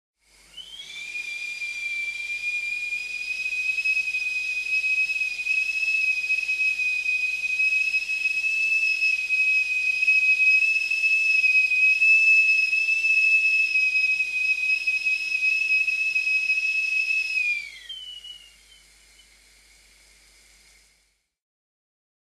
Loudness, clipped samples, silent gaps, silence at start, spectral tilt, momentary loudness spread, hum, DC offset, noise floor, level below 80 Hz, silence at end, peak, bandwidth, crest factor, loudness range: -20 LUFS; under 0.1%; none; 0.55 s; 2.5 dB/octave; 13 LU; none; under 0.1%; -68 dBFS; -64 dBFS; 4 s; -10 dBFS; 14 kHz; 14 dB; 10 LU